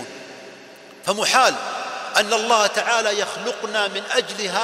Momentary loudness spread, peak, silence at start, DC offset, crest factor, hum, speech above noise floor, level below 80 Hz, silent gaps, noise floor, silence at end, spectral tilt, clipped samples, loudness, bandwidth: 19 LU; -2 dBFS; 0 s; under 0.1%; 20 dB; none; 23 dB; -68 dBFS; none; -43 dBFS; 0 s; -1 dB/octave; under 0.1%; -20 LUFS; 16 kHz